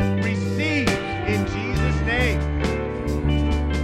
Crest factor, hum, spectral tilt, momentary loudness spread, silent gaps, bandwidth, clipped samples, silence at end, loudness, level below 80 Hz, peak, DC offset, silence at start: 14 dB; none; -6.5 dB/octave; 4 LU; none; 13.5 kHz; under 0.1%; 0 s; -23 LUFS; -28 dBFS; -8 dBFS; under 0.1%; 0 s